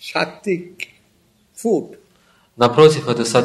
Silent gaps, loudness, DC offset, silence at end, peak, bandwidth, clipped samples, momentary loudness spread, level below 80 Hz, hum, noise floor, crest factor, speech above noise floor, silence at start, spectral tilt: none; -17 LUFS; under 0.1%; 0 s; 0 dBFS; 13 kHz; under 0.1%; 21 LU; -60 dBFS; none; -58 dBFS; 18 dB; 42 dB; 0.05 s; -5 dB/octave